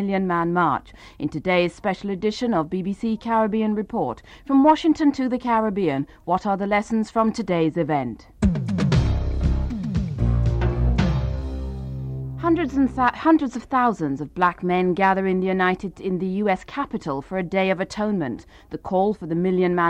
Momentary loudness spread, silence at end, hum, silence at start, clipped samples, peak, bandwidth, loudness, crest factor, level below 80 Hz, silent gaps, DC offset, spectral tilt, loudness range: 9 LU; 0 s; none; 0 s; under 0.1%; -6 dBFS; 9.6 kHz; -22 LUFS; 16 dB; -32 dBFS; none; under 0.1%; -7.5 dB/octave; 3 LU